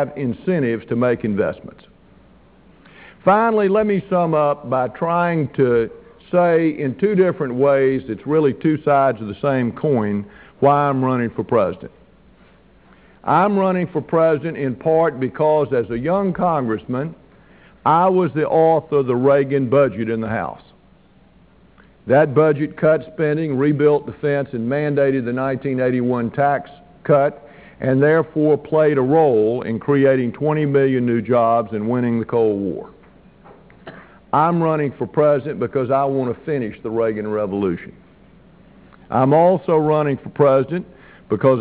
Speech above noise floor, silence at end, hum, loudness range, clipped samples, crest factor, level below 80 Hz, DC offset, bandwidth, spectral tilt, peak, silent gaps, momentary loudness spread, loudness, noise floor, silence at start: 34 dB; 0 s; none; 4 LU; under 0.1%; 16 dB; -52 dBFS; under 0.1%; 4 kHz; -12 dB/octave; -2 dBFS; none; 8 LU; -18 LUFS; -51 dBFS; 0 s